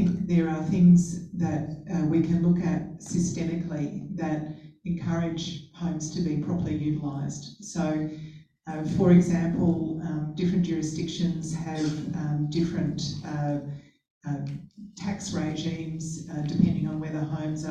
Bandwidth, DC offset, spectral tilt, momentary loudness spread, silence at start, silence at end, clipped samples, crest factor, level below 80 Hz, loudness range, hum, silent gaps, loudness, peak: 9.2 kHz; under 0.1%; -7 dB/octave; 12 LU; 0 s; 0 s; under 0.1%; 18 dB; -52 dBFS; 7 LU; none; 14.10-14.21 s; -27 LUFS; -8 dBFS